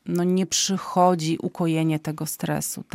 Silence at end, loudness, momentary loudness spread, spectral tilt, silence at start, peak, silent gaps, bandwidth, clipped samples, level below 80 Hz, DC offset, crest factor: 0.1 s; -23 LUFS; 7 LU; -4.5 dB/octave; 0.05 s; -6 dBFS; none; 16.5 kHz; under 0.1%; -62 dBFS; under 0.1%; 18 dB